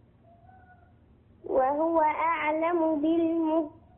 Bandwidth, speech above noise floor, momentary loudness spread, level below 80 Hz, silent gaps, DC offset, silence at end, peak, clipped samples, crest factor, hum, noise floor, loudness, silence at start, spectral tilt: 3.6 kHz; 32 dB; 5 LU; -62 dBFS; none; under 0.1%; 0.25 s; -14 dBFS; under 0.1%; 14 dB; none; -58 dBFS; -26 LUFS; 1.45 s; -9.5 dB/octave